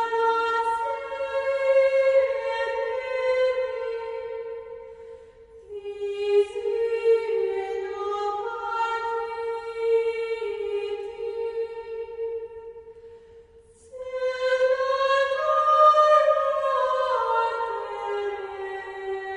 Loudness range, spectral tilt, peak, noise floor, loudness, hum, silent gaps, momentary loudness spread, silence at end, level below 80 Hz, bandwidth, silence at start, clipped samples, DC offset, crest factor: 10 LU; -3 dB/octave; -8 dBFS; -52 dBFS; -25 LUFS; none; none; 15 LU; 0 s; -62 dBFS; 10.5 kHz; 0 s; under 0.1%; under 0.1%; 18 dB